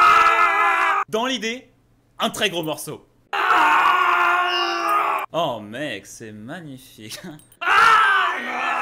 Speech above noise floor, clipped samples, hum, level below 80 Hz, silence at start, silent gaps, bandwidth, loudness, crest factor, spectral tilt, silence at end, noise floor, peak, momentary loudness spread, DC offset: 25 dB; under 0.1%; none; -60 dBFS; 0 s; none; 16 kHz; -18 LUFS; 14 dB; -2.5 dB/octave; 0 s; -52 dBFS; -6 dBFS; 22 LU; under 0.1%